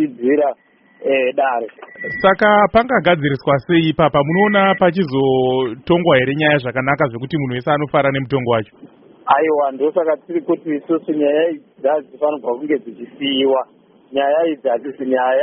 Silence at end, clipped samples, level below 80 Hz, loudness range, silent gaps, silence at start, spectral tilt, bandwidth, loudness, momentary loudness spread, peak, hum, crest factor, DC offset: 0 s; under 0.1%; -50 dBFS; 5 LU; none; 0 s; -4 dB/octave; 5.6 kHz; -17 LUFS; 9 LU; -2 dBFS; none; 16 dB; under 0.1%